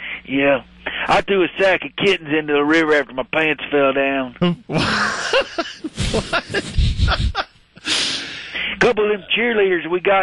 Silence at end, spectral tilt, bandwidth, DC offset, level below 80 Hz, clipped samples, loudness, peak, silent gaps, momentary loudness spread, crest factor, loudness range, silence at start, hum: 0 s; -4.5 dB/octave; 11.5 kHz; under 0.1%; -30 dBFS; under 0.1%; -18 LUFS; -2 dBFS; none; 8 LU; 16 dB; 3 LU; 0 s; none